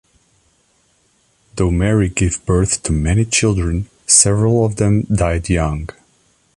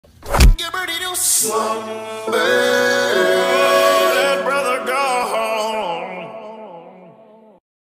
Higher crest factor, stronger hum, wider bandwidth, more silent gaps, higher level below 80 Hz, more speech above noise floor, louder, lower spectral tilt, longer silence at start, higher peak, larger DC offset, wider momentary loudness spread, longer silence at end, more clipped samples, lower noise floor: about the same, 16 dB vs 16 dB; neither; second, 11.5 kHz vs 16 kHz; neither; about the same, -28 dBFS vs -24 dBFS; first, 44 dB vs 27 dB; about the same, -15 LUFS vs -17 LUFS; first, -4.5 dB/octave vs -3 dB/octave; first, 1.55 s vs 0.2 s; about the same, 0 dBFS vs -2 dBFS; neither; second, 11 LU vs 14 LU; about the same, 0.7 s vs 0.8 s; neither; first, -59 dBFS vs -45 dBFS